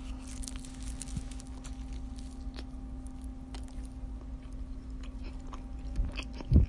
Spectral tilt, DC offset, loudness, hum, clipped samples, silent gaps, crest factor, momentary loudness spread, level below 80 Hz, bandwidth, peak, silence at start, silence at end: -6 dB/octave; under 0.1%; -42 LUFS; none; under 0.1%; none; 26 dB; 6 LU; -38 dBFS; 11.5 kHz; -8 dBFS; 0 s; 0 s